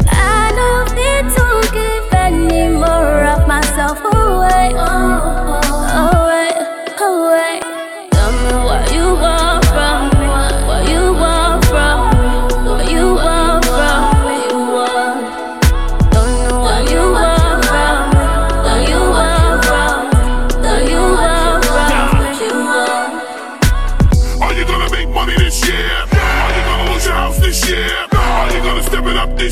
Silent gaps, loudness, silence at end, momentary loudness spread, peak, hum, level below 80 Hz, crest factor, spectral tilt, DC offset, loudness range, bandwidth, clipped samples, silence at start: none; -13 LUFS; 0 s; 4 LU; 0 dBFS; none; -14 dBFS; 12 dB; -4.5 dB/octave; under 0.1%; 2 LU; 16 kHz; under 0.1%; 0 s